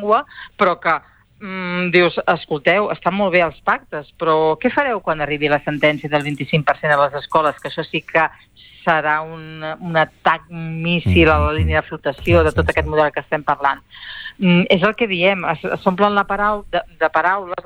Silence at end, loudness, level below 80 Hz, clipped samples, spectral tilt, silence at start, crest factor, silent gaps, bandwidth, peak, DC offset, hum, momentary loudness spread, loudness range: 0.05 s; -17 LUFS; -36 dBFS; under 0.1%; -7 dB/octave; 0 s; 16 dB; none; 10.5 kHz; -2 dBFS; under 0.1%; none; 10 LU; 2 LU